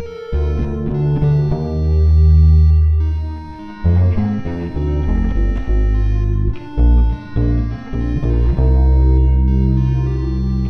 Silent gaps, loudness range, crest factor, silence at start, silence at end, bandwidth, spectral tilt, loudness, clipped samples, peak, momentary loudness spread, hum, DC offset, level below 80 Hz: none; 4 LU; 12 dB; 0 s; 0 s; 4.6 kHz; -10.5 dB/octave; -16 LUFS; under 0.1%; -2 dBFS; 10 LU; none; under 0.1%; -16 dBFS